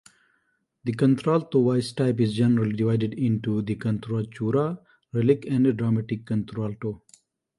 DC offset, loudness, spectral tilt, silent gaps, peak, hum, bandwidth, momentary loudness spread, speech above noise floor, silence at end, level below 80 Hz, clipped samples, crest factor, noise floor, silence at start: under 0.1%; -25 LUFS; -8.5 dB/octave; none; -6 dBFS; none; 11.5 kHz; 10 LU; 48 dB; 0.6 s; -60 dBFS; under 0.1%; 18 dB; -71 dBFS; 0.85 s